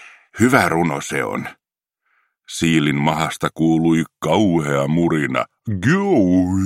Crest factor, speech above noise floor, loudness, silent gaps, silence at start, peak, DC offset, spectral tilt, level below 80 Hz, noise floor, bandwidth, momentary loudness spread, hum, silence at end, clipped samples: 18 dB; 57 dB; -18 LUFS; none; 0 s; 0 dBFS; under 0.1%; -6 dB/octave; -50 dBFS; -75 dBFS; 16 kHz; 9 LU; none; 0 s; under 0.1%